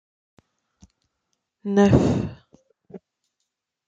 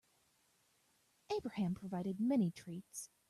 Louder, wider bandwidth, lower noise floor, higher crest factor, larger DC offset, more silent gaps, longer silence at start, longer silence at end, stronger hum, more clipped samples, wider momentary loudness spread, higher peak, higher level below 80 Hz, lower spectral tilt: first, -20 LUFS vs -39 LUFS; second, 7.8 kHz vs 14 kHz; first, -80 dBFS vs -76 dBFS; first, 24 dB vs 16 dB; neither; neither; first, 1.65 s vs 1.3 s; first, 0.9 s vs 0.25 s; neither; neither; first, 17 LU vs 13 LU; first, -2 dBFS vs -26 dBFS; first, -46 dBFS vs -76 dBFS; first, -8 dB/octave vs -6.5 dB/octave